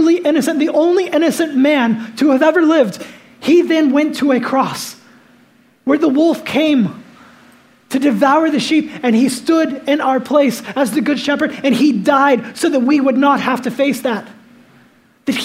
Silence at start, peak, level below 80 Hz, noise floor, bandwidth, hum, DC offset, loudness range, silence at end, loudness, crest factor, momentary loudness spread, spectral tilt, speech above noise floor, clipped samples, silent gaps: 0 s; 0 dBFS; -66 dBFS; -50 dBFS; 16 kHz; none; under 0.1%; 3 LU; 0 s; -14 LUFS; 14 dB; 8 LU; -5 dB/octave; 37 dB; under 0.1%; none